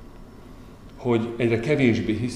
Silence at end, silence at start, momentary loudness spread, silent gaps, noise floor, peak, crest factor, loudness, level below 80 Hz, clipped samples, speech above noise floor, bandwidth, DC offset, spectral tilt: 0 s; 0 s; 4 LU; none; -43 dBFS; -6 dBFS; 18 dB; -23 LUFS; -48 dBFS; under 0.1%; 21 dB; 11 kHz; 0.2%; -7 dB/octave